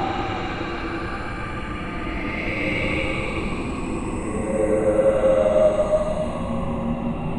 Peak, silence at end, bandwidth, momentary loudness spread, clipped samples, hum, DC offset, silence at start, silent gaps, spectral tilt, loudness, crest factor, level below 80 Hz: -6 dBFS; 0 s; 10.5 kHz; 11 LU; under 0.1%; none; under 0.1%; 0 s; none; -6.5 dB/octave; -23 LUFS; 16 dB; -34 dBFS